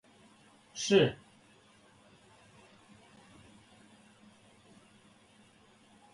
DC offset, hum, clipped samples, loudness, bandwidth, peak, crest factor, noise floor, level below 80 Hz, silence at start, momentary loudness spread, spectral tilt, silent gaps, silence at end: under 0.1%; none; under 0.1%; -29 LUFS; 11.5 kHz; -12 dBFS; 26 dB; -62 dBFS; -72 dBFS; 0.75 s; 31 LU; -4.5 dB/octave; none; 5 s